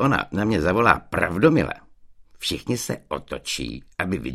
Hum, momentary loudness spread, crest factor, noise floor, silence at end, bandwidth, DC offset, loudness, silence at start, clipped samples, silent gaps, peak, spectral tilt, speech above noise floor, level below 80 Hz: none; 11 LU; 22 dB; -48 dBFS; 0 s; 15.5 kHz; under 0.1%; -23 LUFS; 0 s; under 0.1%; none; 0 dBFS; -5 dB/octave; 25 dB; -44 dBFS